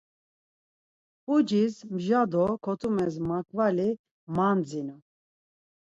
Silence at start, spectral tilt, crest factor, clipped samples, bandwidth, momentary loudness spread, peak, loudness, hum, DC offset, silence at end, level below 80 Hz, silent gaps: 1.3 s; -7.5 dB/octave; 16 dB; under 0.1%; 8 kHz; 10 LU; -12 dBFS; -27 LUFS; none; under 0.1%; 1 s; -64 dBFS; 3.99-4.04 s, 4.11-4.27 s